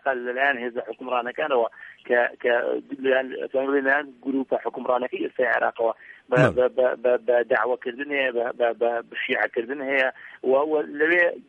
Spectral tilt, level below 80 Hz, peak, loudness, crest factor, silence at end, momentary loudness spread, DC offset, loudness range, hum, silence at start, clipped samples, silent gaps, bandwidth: -7 dB/octave; -66 dBFS; -4 dBFS; -24 LUFS; 20 dB; 0.05 s; 8 LU; under 0.1%; 2 LU; none; 0.05 s; under 0.1%; none; 8.4 kHz